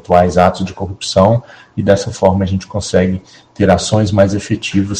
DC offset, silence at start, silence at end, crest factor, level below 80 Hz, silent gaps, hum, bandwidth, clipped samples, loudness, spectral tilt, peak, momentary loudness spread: under 0.1%; 0.1 s; 0 s; 14 dB; -40 dBFS; none; none; 9.8 kHz; 0.7%; -14 LUFS; -6 dB/octave; 0 dBFS; 9 LU